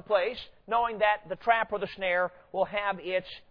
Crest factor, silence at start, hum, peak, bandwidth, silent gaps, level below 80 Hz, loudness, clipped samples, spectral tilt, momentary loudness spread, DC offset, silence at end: 20 dB; 0.1 s; none; -10 dBFS; 5.4 kHz; none; -60 dBFS; -29 LUFS; under 0.1%; -6.5 dB/octave; 6 LU; under 0.1%; 0.1 s